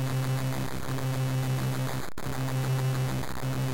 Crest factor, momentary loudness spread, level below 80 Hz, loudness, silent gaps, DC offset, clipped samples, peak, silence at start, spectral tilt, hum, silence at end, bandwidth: 8 dB; 5 LU; -48 dBFS; -31 LUFS; none; 1%; under 0.1%; -22 dBFS; 0 s; -6 dB/octave; none; 0 s; 17 kHz